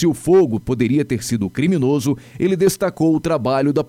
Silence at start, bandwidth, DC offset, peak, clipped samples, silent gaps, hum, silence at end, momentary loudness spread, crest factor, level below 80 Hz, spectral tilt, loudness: 0 s; 16 kHz; under 0.1%; -6 dBFS; under 0.1%; none; none; 0 s; 6 LU; 12 dB; -46 dBFS; -6.5 dB/octave; -18 LUFS